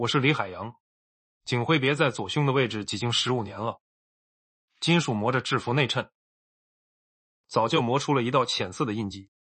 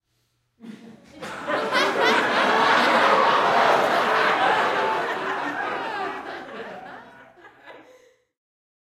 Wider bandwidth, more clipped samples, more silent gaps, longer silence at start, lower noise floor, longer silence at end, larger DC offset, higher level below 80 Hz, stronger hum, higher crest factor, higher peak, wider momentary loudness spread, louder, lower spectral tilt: second, 8.4 kHz vs 16 kHz; neither; first, 0.80-1.41 s, 3.81-4.68 s, 6.15-7.44 s vs none; second, 0 s vs 0.65 s; first, under -90 dBFS vs -70 dBFS; second, 0.2 s vs 1.1 s; neither; about the same, -66 dBFS vs -68 dBFS; neither; about the same, 20 dB vs 18 dB; about the same, -6 dBFS vs -6 dBFS; second, 11 LU vs 19 LU; second, -26 LUFS vs -20 LUFS; first, -5 dB/octave vs -3 dB/octave